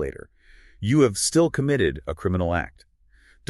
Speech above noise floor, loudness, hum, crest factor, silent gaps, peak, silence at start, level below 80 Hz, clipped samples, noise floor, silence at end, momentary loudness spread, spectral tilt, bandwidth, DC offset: 35 dB; -23 LUFS; none; 18 dB; none; -6 dBFS; 0 s; -44 dBFS; under 0.1%; -57 dBFS; 0.8 s; 13 LU; -5 dB/octave; 13 kHz; under 0.1%